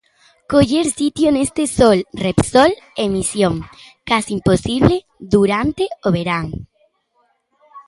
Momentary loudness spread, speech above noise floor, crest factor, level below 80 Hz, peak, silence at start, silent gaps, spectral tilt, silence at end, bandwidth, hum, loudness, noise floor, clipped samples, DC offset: 9 LU; 47 dB; 18 dB; -40 dBFS; 0 dBFS; 0.5 s; none; -5.5 dB/octave; 0.1 s; 11.5 kHz; none; -16 LUFS; -63 dBFS; under 0.1%; under 0.1%